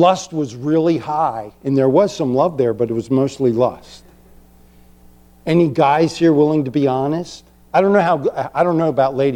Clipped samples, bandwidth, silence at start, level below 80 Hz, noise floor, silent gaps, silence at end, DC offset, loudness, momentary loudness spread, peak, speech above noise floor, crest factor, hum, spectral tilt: under 0.1%; 11 kHz; 0 s; -52 dBFS; -47 dBFS; none; 0 s; under 0.1%; -17 LUFS; 8 LU; -2 dBFS; 31 dB; 16 dB; none; -7 dB/octave